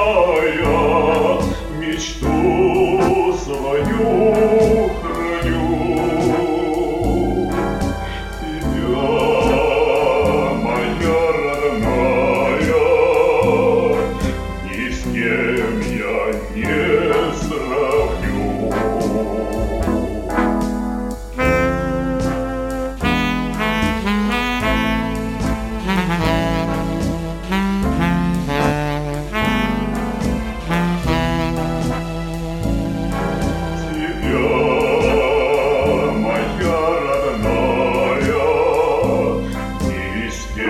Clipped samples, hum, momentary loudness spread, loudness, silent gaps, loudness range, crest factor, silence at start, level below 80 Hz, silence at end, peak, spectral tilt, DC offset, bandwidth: under 0.1%; none; 8 LU; -18 LUFS; none; 4 LU; 16 dB; 0 s; -30 dBFS; 0 s; -2 dBFS; -6 dB/octave; 0.1%; 16 kHz